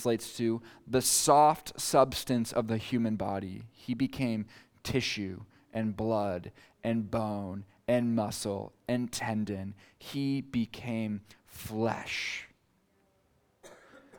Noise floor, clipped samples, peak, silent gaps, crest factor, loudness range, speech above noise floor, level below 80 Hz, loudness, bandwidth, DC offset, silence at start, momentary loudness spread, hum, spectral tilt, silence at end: -71 dBFS; under 0.1%; -10 dBFS; none; 22 dB; 8 LU; 40 dB; -60 dBFS; -31 LUFS; over 20 kHz; under 0.1%; 0 s; 15 LU; none; -4.5 dB/octave; 0 s